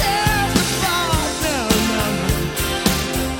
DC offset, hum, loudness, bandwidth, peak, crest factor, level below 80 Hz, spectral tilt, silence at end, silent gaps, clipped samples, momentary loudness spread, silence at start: under 0.1%; none; -18 LUFS; 17 kHz; -2 dBFS; 16 dB; -30 dBFS; -3.5 dB/octave; 0 s; none; under 0.1%; 3 LU; 0 s